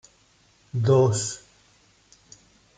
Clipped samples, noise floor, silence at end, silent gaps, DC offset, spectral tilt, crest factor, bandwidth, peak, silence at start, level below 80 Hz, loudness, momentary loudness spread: under 0.1%; -61 dBFS; 1.4 s; none; under 0.1%; -6 dB/octave; 18 dB; 9.4 kHz; -8 dBFS; 0.75 s; -62 dBFS; -23 LUFS; 15 LU